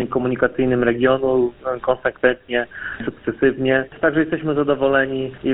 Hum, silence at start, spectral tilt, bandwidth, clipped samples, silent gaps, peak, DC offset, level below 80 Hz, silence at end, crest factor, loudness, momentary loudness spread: none; 0 s; -11.5 dB/octave; 4 kHz; under 0.1%; none; 0 dBFS; under 0.1%; -46 dBFS; 0 s; 20 dB; -19 LUFS; 7 LU